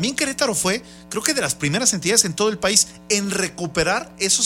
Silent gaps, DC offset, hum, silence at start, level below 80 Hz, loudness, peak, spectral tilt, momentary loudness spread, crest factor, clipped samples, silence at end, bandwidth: none; under 0.1%; none; 0 s; -48 dBFS; -19 LUFS; 0 dBFS; -2 dB/octave; 7 LU; 20 dB; under 0.1%; 0 s; 16.5 kHz